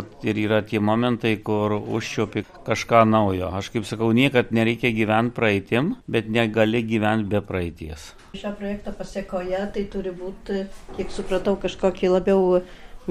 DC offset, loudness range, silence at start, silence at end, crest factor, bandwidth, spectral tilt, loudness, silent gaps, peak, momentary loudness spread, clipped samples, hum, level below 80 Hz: under 0.1%; 8 LU; 0 s; 0 s; 20 dB; 14 kHz; -6.5 dB/octave; -23 LUFS; none; -2 dBFS; 13 LU; under 0.1%; none; -44 dBFS